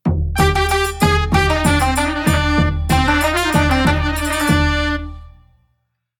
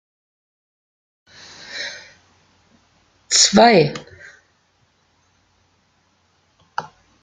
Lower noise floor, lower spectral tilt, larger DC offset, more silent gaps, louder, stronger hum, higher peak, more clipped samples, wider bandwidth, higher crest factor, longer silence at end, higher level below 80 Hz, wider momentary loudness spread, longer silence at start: first, -68 dBFS vs -62 dBFS; first, -5 dB/octave vs -2.5 dB/octave; neither; neither; about the same, -16 LUFS vs -15 LUFS; first, 60 Hz at -45 dBFS vs none; about the same, -2 dBFS vs 0 dBFS; neither; first, 18 kHz vs 11 kHz; second, 16 dB vs 22 dB; first, 0.9 s vs 0.35 s; first, -24 dBFS vs -60 dBFS; second, 4 LU vs 27 LU; second, 0.05 s vs 1.7 s